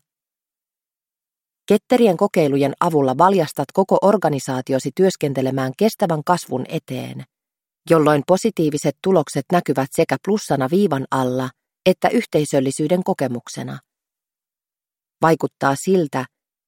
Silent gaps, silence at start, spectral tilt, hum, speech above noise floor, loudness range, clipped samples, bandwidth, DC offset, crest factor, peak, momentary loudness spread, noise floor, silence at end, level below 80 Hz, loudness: none; 1.7 s; -6 dB/octave; none; over 72 dB; 5 LU; under 0.1%; 17 kHz; under 0.1%; 18 dB; -2 dBFS; 11 LU; under -90 dBFS; 0.4 s; -62 dBFS; -19 LUFS